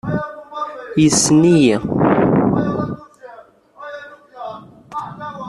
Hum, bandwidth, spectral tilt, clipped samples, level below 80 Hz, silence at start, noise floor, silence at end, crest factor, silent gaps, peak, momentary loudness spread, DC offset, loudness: none; 12.5 kHz; -5 dB/octave; under 0.1%; -48 dBFS; 0.05 s; -43 dBFS; 0 s; 18 dB; none; 0 dBFS; 21 LU; under 0.1%; -15 LUFS